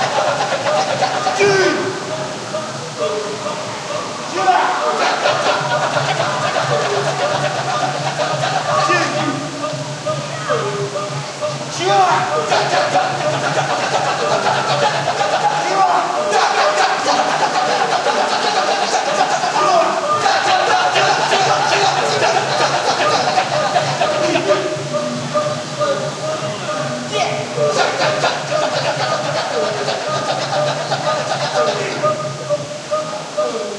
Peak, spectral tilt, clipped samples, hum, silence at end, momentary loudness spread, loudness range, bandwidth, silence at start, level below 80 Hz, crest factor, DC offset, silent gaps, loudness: -2 dBFS; -3 dB/octave; under 0.1%; none; 0 s; 8 LU; 5 LU; 12 kHz; 0 s; -60 dBFS; 16 dB; under 0.1%; none; -17 LUFS